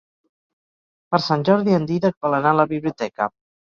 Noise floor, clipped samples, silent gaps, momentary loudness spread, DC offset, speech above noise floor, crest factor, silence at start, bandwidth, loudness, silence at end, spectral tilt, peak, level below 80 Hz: under -90 dBFS; under 0.1%; 2.17-2.21 s; 8 LU; under 0.1%; over 71 dB; 18 dB; 1.1 s; 7.2 kHz; -20 LUFS; 0.5 s; -7.5 dB/octave; -2 dBFS; -60 dBFS